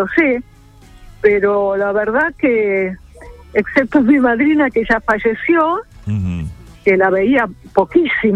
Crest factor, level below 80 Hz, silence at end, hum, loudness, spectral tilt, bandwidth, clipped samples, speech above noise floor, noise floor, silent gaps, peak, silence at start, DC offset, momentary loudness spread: 14 dB; -40 dBFS; 0 s; none; -15 LUFS; -8 dB/octave; 9.4 kHz; under 0.1%; 28 dB; -42 dBFS; none; 0 dBFS; 0 s; under 0.1%; 10 LU